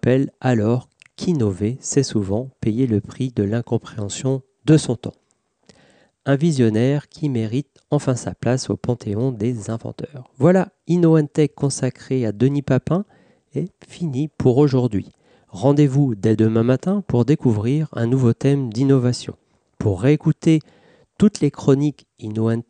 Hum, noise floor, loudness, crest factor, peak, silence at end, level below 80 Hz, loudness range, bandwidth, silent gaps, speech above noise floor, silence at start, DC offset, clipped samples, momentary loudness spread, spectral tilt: none; -56 dBFS; -20 LUFS; 16 dB; -4 dBFS; 0.05 s; -54 dBFS; 4 LU; 10 kHz; none; 37 dB; 0.05 s; under 0.1%; under 0.1%; 12 LU; -7 dB/octave